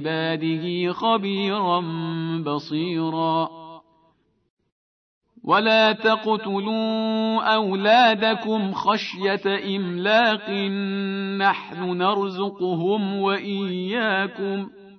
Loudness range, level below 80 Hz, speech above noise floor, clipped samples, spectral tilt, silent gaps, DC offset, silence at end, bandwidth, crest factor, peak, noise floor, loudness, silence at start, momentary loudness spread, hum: 6 LU; -74 dBFS; 42 dB; under 0.1%; -6.5 dB/octave; 4.50-4.57 s, 4.72-5.21 s; under 0.1%; 0.05 s; 6.4 kHz; 18 dB; -6 dBFS; -64 dBFS; -22 LUFS; 0 s; 9 LU; none